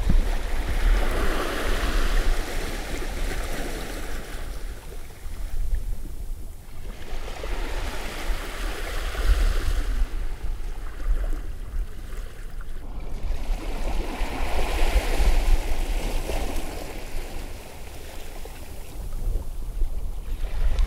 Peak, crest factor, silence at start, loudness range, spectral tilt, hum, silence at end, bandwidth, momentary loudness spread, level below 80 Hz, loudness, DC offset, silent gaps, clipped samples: -8 dBFS; 16 dB; 0 s; 8 LU; -4.5 dB/octave; none; 0 s; 15.5 kHz; 14 LU; -26 dBFS; -31 LUFS; under 0.1%; none; under 0.1%